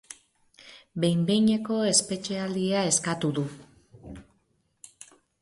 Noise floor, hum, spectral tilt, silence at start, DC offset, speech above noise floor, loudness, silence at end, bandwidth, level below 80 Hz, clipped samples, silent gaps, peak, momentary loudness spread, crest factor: -71 dBFS; none; -4 dB/octave; 0.1 s; under 0.1%; 45 dB; -25 LUFS; 1.2 s; 11.5 kHz; -62 dBFS; under 0.1%; none; -8 dBFS; 24 LU; 20 dB